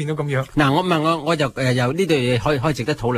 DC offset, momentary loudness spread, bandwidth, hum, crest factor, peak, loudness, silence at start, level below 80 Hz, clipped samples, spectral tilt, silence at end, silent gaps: under 0.1%; 4 LU; 15 kHz; none; 16 dB; -4 dBFS; -19 LUFS; 0 s; -44 dBFS; under 0.1%; -6 dB/octave; 0 s; none